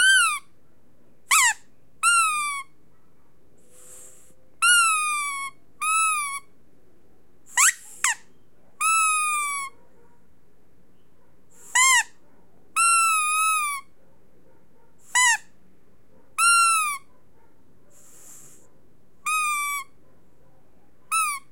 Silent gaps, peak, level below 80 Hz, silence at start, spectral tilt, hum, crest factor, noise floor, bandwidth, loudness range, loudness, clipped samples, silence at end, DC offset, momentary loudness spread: none; -4 dBFS; -72 dBFS; 0 s; 4 dB/octave; none; 22 dB; -62 dBFS; 16.5 kHz; 6 LU; -21 LUFS; under 0.1%; 0.15 s; 0.6%; 15 LU